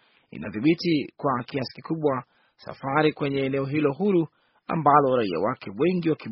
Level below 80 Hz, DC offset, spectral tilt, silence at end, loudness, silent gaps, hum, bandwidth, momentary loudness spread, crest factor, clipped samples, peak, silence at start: -64 dBFS; under 0.1%; -5.5 dB/octave; 0 s; -25 LUFS; none; none; 5.8 kHz; 15 LU; 22 dB; under 0.1%; -4 dBFS; 0.35 s